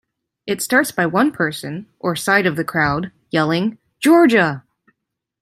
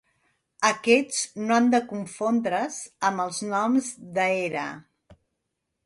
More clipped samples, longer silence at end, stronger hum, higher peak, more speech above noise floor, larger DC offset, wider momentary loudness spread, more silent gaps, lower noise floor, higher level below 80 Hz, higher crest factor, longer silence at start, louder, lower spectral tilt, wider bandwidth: neither; about the same, 0.8 s vs 0.7 s; neither; first, -2 dBFS vs -6 dBFS; first, 61 dB vs 56 dB; neither; about the same, 13 LU vs 11 LU; neither; about the same, -78 dBFS vs -80 dBFS; first, -54 dBFS vs -70 dBFS; about the same, 16 dB vs 20 dB; second, 0.45 s vs 0.6 s; first, -17 LUFS vs -25 LUFS; first, -5 dB/octave vs -3.5 dB/octave; first, 15.5 kHz vs 11.5 kHz